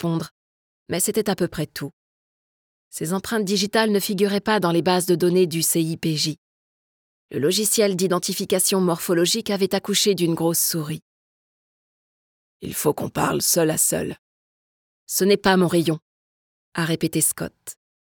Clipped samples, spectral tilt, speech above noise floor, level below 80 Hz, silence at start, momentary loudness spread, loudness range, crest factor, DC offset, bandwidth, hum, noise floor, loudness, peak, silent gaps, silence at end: under 0.1%; -4 dB/octave; over 69 dB; -58 dBFS; 0 s; 14 LU; 5 LU; 18 dB; under 0.1%; 19 kHz; none; under -90 dBFS; -21 LUFS; -6 dBFS; 0.31-0.86 s, 1.93-2.91 s, 6.38-7.29 s, 11.02-12.60 s, 14.19-15.07 s, 16.02-16.72 s; 0.4 s